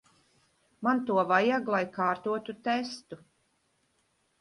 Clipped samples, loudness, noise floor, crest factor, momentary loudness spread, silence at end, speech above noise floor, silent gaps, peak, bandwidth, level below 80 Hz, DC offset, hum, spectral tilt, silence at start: under 0.1%; -29 LUFS; -73 dBFS; 20 dB; 16 LU; 1.25 s; 44 dB; none; -10 dBFS; 11.5 kHz; -76 dBFS; under 0.1%; none; -5.5 dB/octave; 0.8 s